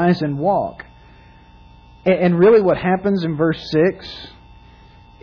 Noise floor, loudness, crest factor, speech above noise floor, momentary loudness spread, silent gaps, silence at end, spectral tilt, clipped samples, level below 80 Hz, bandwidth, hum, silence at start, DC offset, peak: -45 dBFS; -17 LUFS; 14 dB; 29 dB; 21 LU; none; 0.95 s; -8.5 dB/octave; under 0.1%; -48 dBFS; 5.4 kHz; 60 Hz at -35 dBFS; 0 s; under 0.1%; -4 dBFS